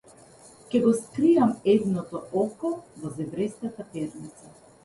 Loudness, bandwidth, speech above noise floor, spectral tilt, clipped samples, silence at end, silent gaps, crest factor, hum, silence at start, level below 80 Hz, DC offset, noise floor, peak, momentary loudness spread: -26 LUFS; 11.5 kHz; 26 dB; -7 dB/octave; under 0.1%; 0.35 s; none; 18 dB; none; 0.7 s; -64 dBFS; under 0.1%; -51 dBFS; -10 dBFS; 14 LU